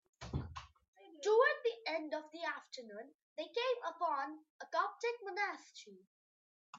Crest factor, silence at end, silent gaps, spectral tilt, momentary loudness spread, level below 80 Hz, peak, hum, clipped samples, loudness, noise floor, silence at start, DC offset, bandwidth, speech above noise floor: 22 dB; 0 s; 0.88-0.93 s, 3.14-3.36 s, 4.50-4.59 s, 6.07-6.73 s; -4.5 dB/octave; 20 LU; -64 dBFS; -18 dBFS; none; under 0.1%; -38 LUFS; under -90 dBFS; 0.2 s; under 0.1%; 7.8 kHz; over 48 dB